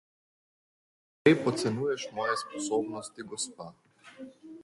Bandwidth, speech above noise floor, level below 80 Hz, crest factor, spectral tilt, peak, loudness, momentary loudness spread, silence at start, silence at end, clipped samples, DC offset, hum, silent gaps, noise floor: 11.5 kHz; 19 dB; -72 dBFS; 24 dB; -4.5 dB/octave; -8 dBFS; -30 LUFS; 23 LU; 1.25 s; 0 s; under 0.1%; under 0.1%; none; none; -49 dBFS